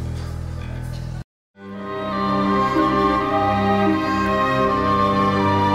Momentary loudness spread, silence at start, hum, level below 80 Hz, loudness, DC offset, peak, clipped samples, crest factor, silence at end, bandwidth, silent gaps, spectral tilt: 12 LU; 0 s; none; -38 dBFS; -20 LUFS; under 0.1%; -6 dBFS; under 0.1%; 14 dB; 0 s; 14 kHz; 1.24-1.54 s; -7 dB/octave